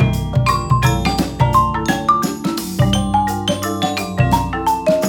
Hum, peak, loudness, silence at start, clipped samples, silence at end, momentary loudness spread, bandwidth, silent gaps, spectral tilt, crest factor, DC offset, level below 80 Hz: none; -2 dBFS; -17 LUFS; 0 s; under 0.1%; 0 s; 5 LU; 19.5 kHz; none; -5.5 dB/octave; 14 dB; under 0.1%; -30 dBFS